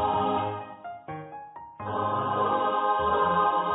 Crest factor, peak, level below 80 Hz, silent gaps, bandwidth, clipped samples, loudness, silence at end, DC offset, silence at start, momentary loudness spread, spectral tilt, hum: 16 dB; -12 dBFS; -54 dBFS; none; 4 kHz; under 0.1%; -26 LUFS; 0 s; under 0.1%; 0 s; 17 LU; -9.5 dB/octave; none